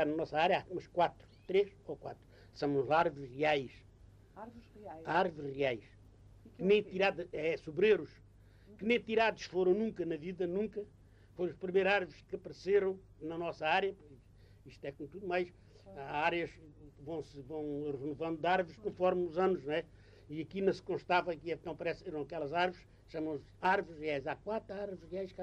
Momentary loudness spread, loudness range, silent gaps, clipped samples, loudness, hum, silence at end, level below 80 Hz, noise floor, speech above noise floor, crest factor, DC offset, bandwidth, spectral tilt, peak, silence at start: 16 LU; 5 LU; none; under 0.1%; -35 LUFS; none; 0 s; -64 dBFS; -60 dBFS; 25 dB; 18 dB; under 0.1%; 8.2 kHz; -6.5 dB/octave; -18 dBFS; 0 s